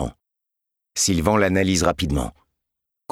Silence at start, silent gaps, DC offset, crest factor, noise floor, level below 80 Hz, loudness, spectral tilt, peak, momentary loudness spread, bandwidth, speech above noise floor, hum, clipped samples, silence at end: 0 s; none; under 0.1%; 20 dB; -83 dBFS; -38 dBFS; -20 LUFS; -4 dB/octave; -4 dBFS; 13 LU; 16.5 kHz; 63 dB; none; under 0.1%; 0.8 s